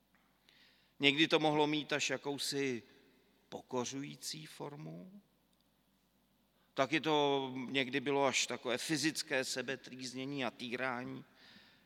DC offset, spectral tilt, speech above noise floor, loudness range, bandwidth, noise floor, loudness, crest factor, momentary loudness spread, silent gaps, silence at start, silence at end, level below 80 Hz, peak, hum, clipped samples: under 0.1%; -3 dB/octave; 38 dB; 12 LU; 16.5 kHz; -74 dBFS; -35 LUFS; 28 dB; 16 LU; none; 1 s; 0.35 s; -84 dBFS; -10 dBFS; none; under 0.1%